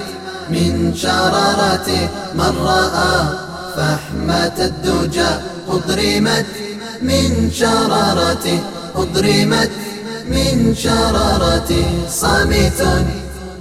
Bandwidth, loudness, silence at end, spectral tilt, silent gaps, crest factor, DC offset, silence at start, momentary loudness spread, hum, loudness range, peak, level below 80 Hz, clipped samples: 16 kHz; -16 LUFS; 0 s; -4.5 dB/octave; none; 14 dB; under 0.1%; 0 s; 9 LU; none; 2 LU; -2 dBFS; -28 dBFS; under 0.1%